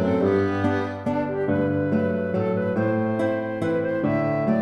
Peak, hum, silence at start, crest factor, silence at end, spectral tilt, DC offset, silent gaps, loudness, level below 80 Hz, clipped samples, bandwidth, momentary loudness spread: -10 dBFS; none; 0 s; 14 dB; 0 s; -9 dB/octave; under 0.1%; none; -23 LUFS; -56 dBFS; under 0.1%; 10.5 kHz; 4 LU